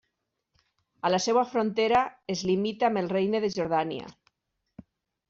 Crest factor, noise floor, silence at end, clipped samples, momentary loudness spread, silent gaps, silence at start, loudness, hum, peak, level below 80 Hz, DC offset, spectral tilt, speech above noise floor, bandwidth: 16 dB; -81 dBFS; 1.2 s; under 0.1%; 8 LU; none; 1.05 s; -27 LUFS; none; -12 dBFS; -66 dBFS; under 0.1%; -4 dB/octave; 55 dB; 7.8 kHz